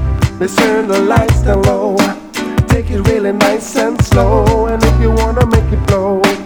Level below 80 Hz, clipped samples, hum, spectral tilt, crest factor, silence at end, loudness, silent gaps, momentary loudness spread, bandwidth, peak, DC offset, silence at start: -18 dBFS; under 0.1%; none; -6 dB/octave; 12 dB; 0 s; -12 LUFS; none; 4 LU; 19.5 kHz; 0 dBFS; under 0.1%; 0 s